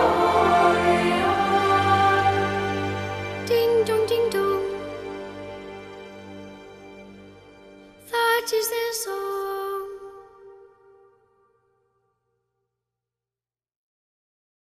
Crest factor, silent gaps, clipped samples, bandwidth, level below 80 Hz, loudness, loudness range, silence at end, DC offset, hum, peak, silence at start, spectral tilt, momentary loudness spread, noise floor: 20 dB; none; under 0.1%; 15.5 kHz; -54 dBFS; -22 LUFS; 16 LU; 4.25 s; under 0.1%; 60 Hz at -75 dBFS; -6 dBFS; 0 s; -4.5 dB/octave; 22 LU; under -90 dBFS